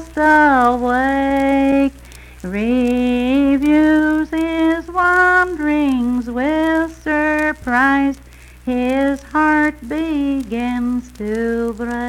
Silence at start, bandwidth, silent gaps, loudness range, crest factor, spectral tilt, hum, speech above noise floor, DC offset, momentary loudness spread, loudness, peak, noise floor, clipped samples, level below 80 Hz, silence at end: 0 s; 14 kHz; none; 4 LU; 14 dB; -5.5 dB/octave; none; 22 dB; under 0.1%; 9 LU; -16 LUFS; -2 dBFS; -38 dBFS; under 0.1%; -38 dBFS; 0 s